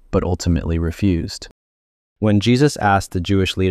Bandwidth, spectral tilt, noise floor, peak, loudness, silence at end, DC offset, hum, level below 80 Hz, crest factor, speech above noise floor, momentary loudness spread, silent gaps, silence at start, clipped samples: 13.5 kHz; -6 dB/octave; under -90 dBFS; -2 dBFS; -18 LUFS; 0 s; under 0.1%; none; -32 dBFS; 16 dB; over 73 dB; 7 LU; 1.51-2.16 s; 0.1 s; under 0.1%